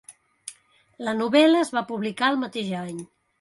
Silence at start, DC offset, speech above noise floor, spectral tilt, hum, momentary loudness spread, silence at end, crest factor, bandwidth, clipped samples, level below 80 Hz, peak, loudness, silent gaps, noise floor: 0.1 s; under 0.1%; 32 dB; -4.5 dB/octave; none; 23 LU; 0.35 s; 18 dB; 11.5 kHz; under 0.1%; -72 dBFS; -6 dBFS; -23 LUFS; none; -55 dBFS